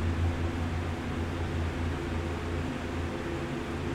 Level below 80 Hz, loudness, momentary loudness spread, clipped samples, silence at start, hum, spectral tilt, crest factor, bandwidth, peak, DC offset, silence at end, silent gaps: -40 dBFS; -33 LUFS; 3 LU; under 0.1%; 0 s; none; -6.5 dB/octave; 12 dB; 11.5 kHz; -20 dBFS; under 0.1%; 0 s; none